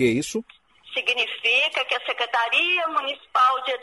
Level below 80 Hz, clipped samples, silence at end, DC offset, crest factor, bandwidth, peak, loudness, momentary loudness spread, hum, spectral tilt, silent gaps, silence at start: -64 dBFS; under 0.1%; 0 s; under 0.1%; 16 dB; 11.5 kHz; -8 dBFS; -21 LUFS; 7 LU; none; -3 dB/octave; none; 0 s